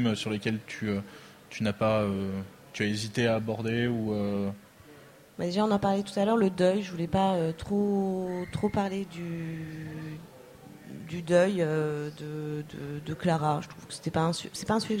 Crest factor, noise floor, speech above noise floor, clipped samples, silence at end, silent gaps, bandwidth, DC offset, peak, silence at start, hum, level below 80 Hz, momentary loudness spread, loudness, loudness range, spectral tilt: 18 dB; -53 dBFS; 24 dB; under 0.1%; 0 s; none; 16 kHz; under 0.1%; -10 dBFS; 0 s; none; -58 dBFS; 14 LU; -30 LUFS; 4 LU; -6 dB/octave